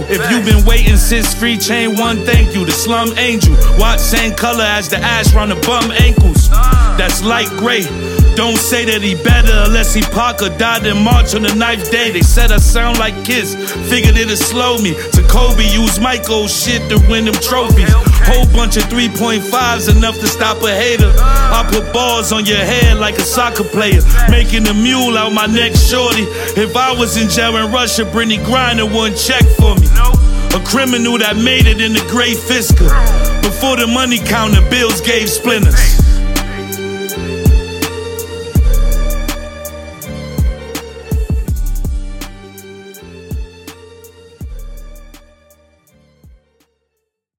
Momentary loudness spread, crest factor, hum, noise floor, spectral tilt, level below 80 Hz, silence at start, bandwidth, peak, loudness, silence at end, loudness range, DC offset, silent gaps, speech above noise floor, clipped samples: 10 LU; 10 dB; none; -71 dBFS; -4 dB/octave; -14 dBFS; 0 s; 17.5 kHz; 0 dBFS; -12 LUFS; 2.3 s; 8 LU; under 0.1%; none; 62 dB; under 0.1%